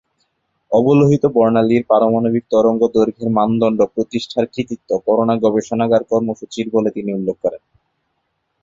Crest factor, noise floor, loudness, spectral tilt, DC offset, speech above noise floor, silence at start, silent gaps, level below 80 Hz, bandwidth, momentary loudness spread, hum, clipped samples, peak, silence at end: 14 dB; -70 dBFS; -16 LUFS; -7.5 dB/octave; under 0.1%; 54 dB; 0.7 s; none; -54 dBFS; 7.6 kHz; 8 LU; none; under 0.1%; -2 dBFS; 1.05 s